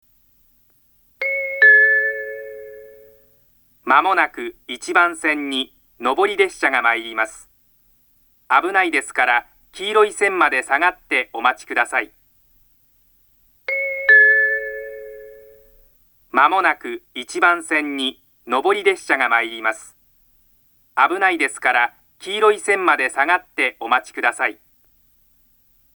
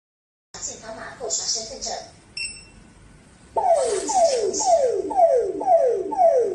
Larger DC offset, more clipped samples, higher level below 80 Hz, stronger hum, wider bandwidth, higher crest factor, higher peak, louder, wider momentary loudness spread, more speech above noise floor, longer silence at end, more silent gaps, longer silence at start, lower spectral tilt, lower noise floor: neither; neither; second, -62 dBFS vs -56 dBFS; neither; first, over 20 kHz vs 11 kHz; about the same, 20 dB vs 16 dB; first, 0 dBFS vs -8 dBFS; first, -17 LUFS vs -21 LUFS; about the same, 16 LU vs 16 LU; first, 39 dB vs 27 dB; first, 1.45 s vs 0 s; neither; first, 1.2 s vs 0.55 s; about the same, -1.5 dB/octave vs -1.5 dB/octave; first, -58 dBFS vs -49 dBFS